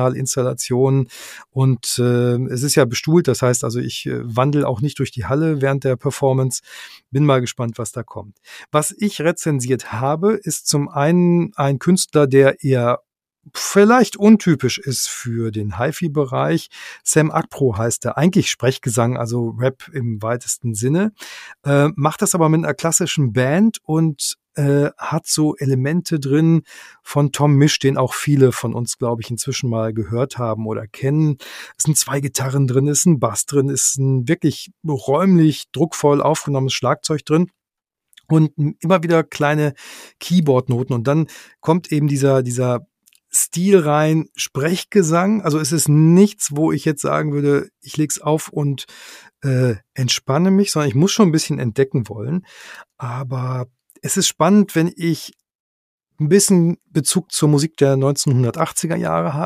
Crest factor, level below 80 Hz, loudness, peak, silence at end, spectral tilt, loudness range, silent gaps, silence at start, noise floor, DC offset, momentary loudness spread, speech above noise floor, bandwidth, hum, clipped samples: 18 dB; -56 dBFS; -18 LUFS; 0 dBFS; 0 s; -5.5 dB/octave; 4 LU; 55.55-55.98 s; 0 s; -85 dBFS; under 0.1%; 10 LU; 68 dB; 15.5 kHz; none; under 0.1%